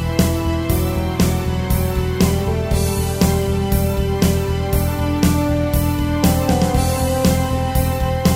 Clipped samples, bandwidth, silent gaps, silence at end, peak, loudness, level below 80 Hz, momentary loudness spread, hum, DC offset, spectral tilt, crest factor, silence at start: under 0.1%; 16.5 kHz; none; 0 s; 0 dBFS; -18 LUFS; -24 dBFS; 3 LU; none; under 0.1%; -6 dB/octave; 16 dB; 0 s